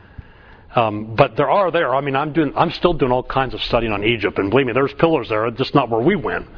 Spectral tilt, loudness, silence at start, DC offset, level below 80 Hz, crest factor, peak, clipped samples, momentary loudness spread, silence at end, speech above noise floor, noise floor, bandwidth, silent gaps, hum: -8 dB/octave; -18 LUFS; 0.2 s; under 0.1%; -38 dBFS; 18 dB; 0 dBFS; under 0.1%; 4 LU; 0 s; 26 dB; -44 dBFS; 5.4 kHz; none; none